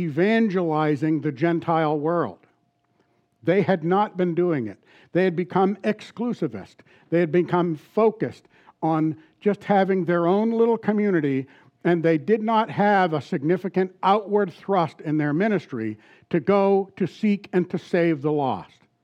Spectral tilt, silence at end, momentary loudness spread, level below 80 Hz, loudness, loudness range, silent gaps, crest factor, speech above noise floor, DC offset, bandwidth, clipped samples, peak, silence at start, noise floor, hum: -8.5 dB/octave; 0.4 s; 8 LU; -76 dBFS; -23 LUFS; 3 LU; none; 16 dB; 45 dB; under 0.1%; 8.4 kHz; under 0.1%; -8 dBFS; 0 s; -67 dBFS; none